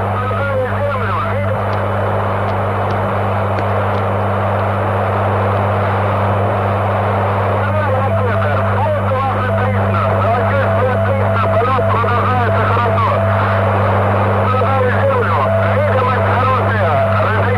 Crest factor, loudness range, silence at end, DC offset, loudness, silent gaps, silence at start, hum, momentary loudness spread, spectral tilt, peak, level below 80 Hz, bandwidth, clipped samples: 12 dB; 3 LU; 0 s; under 0.1%; -15 LUFS; none; 0 s; 50 Hz at -20 dBFS; 3 LU; -8.5 dB/octave; -2 dBFS; -40 dBFS; 5.2 kHz; under 0.1%